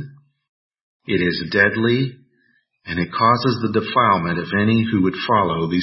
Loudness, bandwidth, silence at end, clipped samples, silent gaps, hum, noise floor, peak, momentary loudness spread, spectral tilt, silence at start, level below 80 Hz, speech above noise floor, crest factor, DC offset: -18 LUFS; 5.8 kHz; 0 s; under 0.1%; 0.49-0.70 s, 0.81-1.00 s; none; -63 dBFS; -2 dBFS; 9 LU; -9.5 dB/octave; 0 s; -52 dBFS; 45 dB; 18 dB; under 0.1%